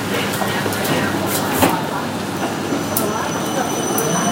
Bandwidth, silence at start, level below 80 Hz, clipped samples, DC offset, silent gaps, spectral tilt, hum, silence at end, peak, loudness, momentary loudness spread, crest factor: 17 kHz; 0 s; -50 dBFS; under 0.1%; under 0.1%; none; -4 dB/octave; none; 0 s; 0 dBFS; -19 LUFS; 6 LU; 20 dB